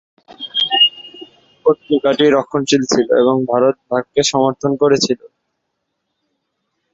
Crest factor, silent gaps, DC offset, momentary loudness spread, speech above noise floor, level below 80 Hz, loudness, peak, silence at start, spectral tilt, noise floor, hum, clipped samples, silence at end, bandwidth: 16 dB; none; under 0.1%; 9 LU; 58 dB; -56 dBFS; -15 LUFS; -2 dBFS; 0.4 s; -3.5 dB/octave; -73 dBFS; none; under 0.1%; 1.65 s; 8 kHz